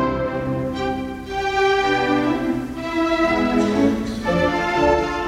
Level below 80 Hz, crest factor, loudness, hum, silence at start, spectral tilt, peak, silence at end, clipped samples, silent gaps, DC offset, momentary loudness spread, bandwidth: -38 dBFS; 14 dB; -20 LUFS; none; 0 s; -6 dB/octave; -4 dBFS; 0 s; under 0.1%; none; under 0.1%; 7 LU; 15.5 kHz